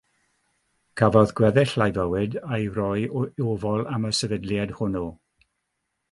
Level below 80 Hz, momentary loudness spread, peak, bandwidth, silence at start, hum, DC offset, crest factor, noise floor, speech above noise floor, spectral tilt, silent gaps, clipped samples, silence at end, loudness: -50 dBFS; 9 LU; -2 dBFS; 11.5 kHz; 0.95 s; none; under 0.1%; 22 dB; -78 dBFS; 55 dB; -6 dB/octave; none; under 0.1%; 1 s; -24 LUFS